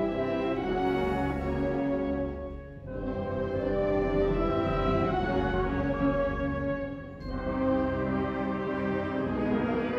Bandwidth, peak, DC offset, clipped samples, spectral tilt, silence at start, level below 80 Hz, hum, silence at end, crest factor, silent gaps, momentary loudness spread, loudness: 7.4 kHz; -16 dBFS; under 0.1%; under 0.1%; -8.5 dB/octave; 0 s; -40 dBFS; none; 0 s; 14 dB; none; 8 LU; -30 LUFS